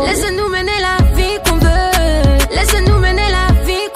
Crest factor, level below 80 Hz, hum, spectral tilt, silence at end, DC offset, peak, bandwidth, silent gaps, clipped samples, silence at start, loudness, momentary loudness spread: 12 dB; -16 dBFS; none; -4.5 dB/octave; 0 s; under 0.1%; 0 dBFS; 16 kHz; none; under 0.1%; 0 s; -13 LUFS; 3 LU